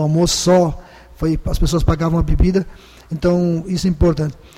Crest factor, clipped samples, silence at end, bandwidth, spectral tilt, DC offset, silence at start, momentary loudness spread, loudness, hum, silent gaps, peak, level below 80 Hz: 12 dB; under 0.1%; 0.25 s; 15.5 kHz; -6 dB/octave; under 0.1%; 0 s; 9 LU; -17 LUFS; none; none; -4 dBFS; -24 dBFS